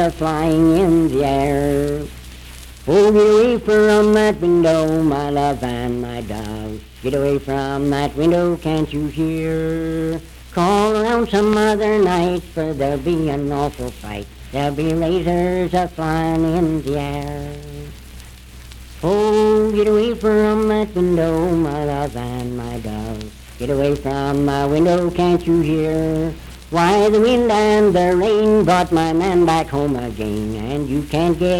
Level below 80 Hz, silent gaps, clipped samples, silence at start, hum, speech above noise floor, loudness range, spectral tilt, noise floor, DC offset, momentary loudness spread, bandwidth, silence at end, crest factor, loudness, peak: -36 dBFS; none; under 0.1%; 0 s; none; 21 dB; 6 LU; -6.5 dB/octave; -38 dBFS; under 0.1%; 13 LU; 16.5 kHz; 0 s; 14 dB; -17 LUFS; -4 dBFS